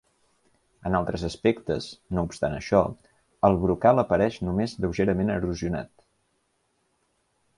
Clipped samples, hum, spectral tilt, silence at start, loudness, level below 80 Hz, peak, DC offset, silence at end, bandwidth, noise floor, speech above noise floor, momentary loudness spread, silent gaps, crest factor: under 0.1%; none; -7 dB/octave; 0.85 s; -25 LUFS; -46 dBFS; -4 dBFS; under 0.1%; 1.7 s; 11.5 kHz; -72 dBFS; 47 dB; 10 LU; none; 22 dB